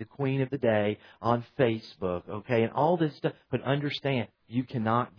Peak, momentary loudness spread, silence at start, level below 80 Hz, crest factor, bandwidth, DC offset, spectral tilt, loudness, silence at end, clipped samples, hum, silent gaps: -10 dBFS; 8 LU; 0 s; -64 dBFS; 20 dB; 5.4 kHz; under 0.1%; -8.5 dB/octave; -29 LUFS; 0.1 s; under 0.1%; none; none